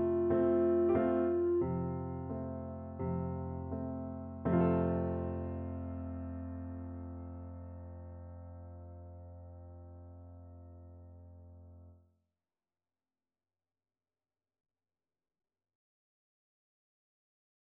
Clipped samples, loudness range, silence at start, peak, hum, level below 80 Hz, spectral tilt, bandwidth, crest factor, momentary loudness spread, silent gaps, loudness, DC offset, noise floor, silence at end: under 0.1%; 21 LU; 0 s; -20 dBFS; none; -56 dBFS; -12 dB/octave; 3.4 kHz; 18 dB; 24 LU; none; -35 LUFS; under 0.1%; under -90 dBFS; 5.7 s